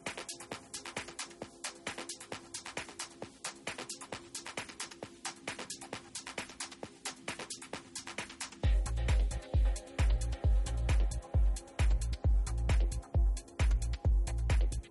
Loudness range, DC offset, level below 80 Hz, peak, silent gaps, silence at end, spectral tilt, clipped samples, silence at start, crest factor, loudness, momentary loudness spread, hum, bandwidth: 9 LU; under 0.1%; -34 dBFS; -20 dBFS; none; 0.05 s; -4.5 dB/octave; under 0.1%; 0.05 s; 12 dB; -37 LUFS; 10 LU; none; 11.5 kHz